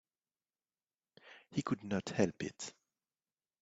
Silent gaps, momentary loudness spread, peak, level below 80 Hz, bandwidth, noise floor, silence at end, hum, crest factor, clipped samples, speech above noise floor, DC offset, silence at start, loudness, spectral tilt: none; 17 LU; -16 dBFS; -74 dBFS; 8 kHz; under -90 dBFS; 0.9 s; none; 26 dB; under 0.1%; over 53 dB; under 0.1%; 1.25 s; -39 LUFS; -5.5 dB/octave